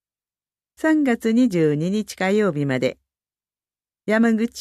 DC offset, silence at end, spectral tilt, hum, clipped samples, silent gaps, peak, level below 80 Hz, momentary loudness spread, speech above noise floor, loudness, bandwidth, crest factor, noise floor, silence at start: under 0.1%; 0 s; -6.5 dB/octave; 50 Hz at -45 dBFS; under 0.1%; none; -8 dBFS; -62 dBFS; 6 LU; over 71 dB; -20 LUFS; 13.5 kHz; 14 dB; under -90 dBFS; 0.85 s